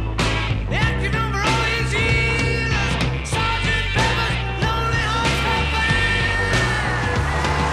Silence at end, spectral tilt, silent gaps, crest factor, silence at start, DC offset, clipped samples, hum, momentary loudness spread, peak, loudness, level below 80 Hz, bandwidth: 0 s; -4.5 dB/octave; none; 14 dB; 0 s; 0.1%; under 0.1%; none; 4 LU; -6 dBFS; -19 LUFS; -28 dBFS; 13.5 kHz